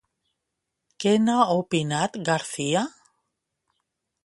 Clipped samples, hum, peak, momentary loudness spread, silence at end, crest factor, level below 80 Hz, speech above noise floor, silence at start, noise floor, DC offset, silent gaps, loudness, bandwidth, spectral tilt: under 0.1%; none; -6 dBFS; 6 LU; 1.35 s; 22 dB; -68 dBFS; 59 dB; 1 s; -82 dBFS; under 0.1%; none; -24 LUFS; 11.5 kHz; -5 dB/octave